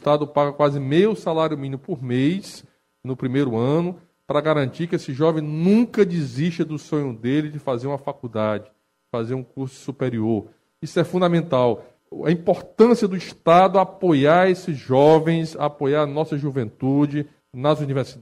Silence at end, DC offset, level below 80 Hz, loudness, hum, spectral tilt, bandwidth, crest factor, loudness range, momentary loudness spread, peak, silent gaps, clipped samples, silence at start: 0 s; under 0.1%; -62 dBFS; -21 LUFS; none; -7.5 dB/octave; 12.5 kHz; 18 dB; 8 LU; 13 LU; -2 dBFS; none; under 0.1%; 0 s